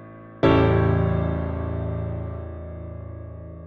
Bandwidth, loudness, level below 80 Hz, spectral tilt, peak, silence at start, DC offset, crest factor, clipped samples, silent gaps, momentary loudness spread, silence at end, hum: 5 kHz; -23 LUFS; -34 dBFS; -9.5 dB/octave; -6 dBFS; 0 s; under 0.1%; 18 dB; under 0.1%; none; 19 LU; 0 s; none